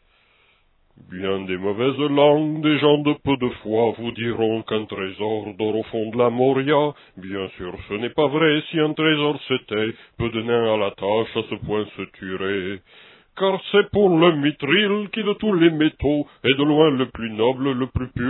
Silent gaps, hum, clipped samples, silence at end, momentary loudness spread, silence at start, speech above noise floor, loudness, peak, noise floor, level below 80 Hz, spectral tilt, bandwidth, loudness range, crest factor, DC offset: none; none; under 0.1%; 0 s; 11 LU; 1.1 s; 39 dB; -21 LUFS; -2 dBFS; -60 dBFS; -48 dBFS; -10 dB/octave; 4.2 kHz; 5 LU; 20 dB; under 0.1%